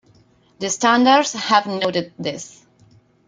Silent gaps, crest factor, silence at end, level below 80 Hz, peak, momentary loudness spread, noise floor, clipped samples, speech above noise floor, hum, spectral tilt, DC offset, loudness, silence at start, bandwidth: none; 20 dB; 0.8 s; -64 dBFS; -2 dBFS; 15 LU; -55 dBFS; under 0.1%; 36 dB; none; -3 dB/octave; under 0.1%; -18 LUFS; 0.6 s; 9.6 kHz